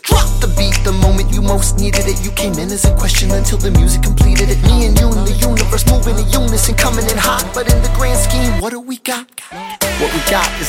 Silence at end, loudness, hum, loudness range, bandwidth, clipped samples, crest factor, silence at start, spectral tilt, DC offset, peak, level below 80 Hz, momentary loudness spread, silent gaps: 0 s; -14 LUFS; none; 3 LU; 16.5 kHz; under 0.1%; 12 dB; 0.05 s; -4 dB/octave; under 0.1%; 0 dBFS; -14 dBFS; 6 LU; none